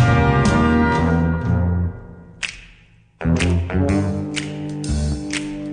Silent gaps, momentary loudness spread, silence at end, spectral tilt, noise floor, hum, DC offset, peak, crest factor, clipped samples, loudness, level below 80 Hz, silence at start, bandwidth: none; 12 LU; 0 s; -6.5 dB/octave; -50 dBFS; none; under 0.1%; -4 dBFS; 16 dB; under 0.1%; -20 LUFS; -30 dBFS; 0 s; 10 kHz